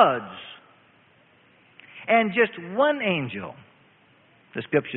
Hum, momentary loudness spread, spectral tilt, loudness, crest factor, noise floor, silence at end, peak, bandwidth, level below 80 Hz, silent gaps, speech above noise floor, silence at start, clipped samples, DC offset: none; 20 LU; -10 dB/octave; -24 LUFS; 24 dB; -58 dBFS; 0 s; -2 dBFS; 4.2 kHz; -70 dBFS; none; 35 dB; 0 s; under 0.1%; under 0.1%